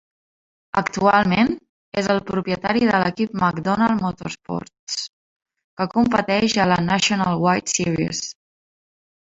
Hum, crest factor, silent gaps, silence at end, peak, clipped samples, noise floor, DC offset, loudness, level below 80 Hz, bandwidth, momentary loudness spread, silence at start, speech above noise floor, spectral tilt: none; 20 dB; 1.69-1.92 s, 4.79-4.87 s, 5.09-5.40 s, 5.64-5.77 s; 0.95 s; -2 dBFS; under 0.1%; under -90 dBFS; under 0.1%; -20 LUFS; -52 dBFS; 8 kHz; 11 LU; 0.75 s; over 70 dB; -4.5 dB/octave